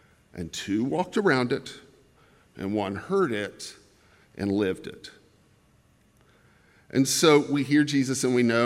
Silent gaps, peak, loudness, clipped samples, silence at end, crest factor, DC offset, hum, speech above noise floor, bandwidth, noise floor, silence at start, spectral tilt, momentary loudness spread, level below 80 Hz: none; -6 dBFS; -25 LUFS; under 0.1%; 0 s; 22 dB; under 0.1%; none; 37 dB; 16 kHz; -62 dBFS; 0.35 s; -4.5 dB/octave; 20 LU; -66 dBFS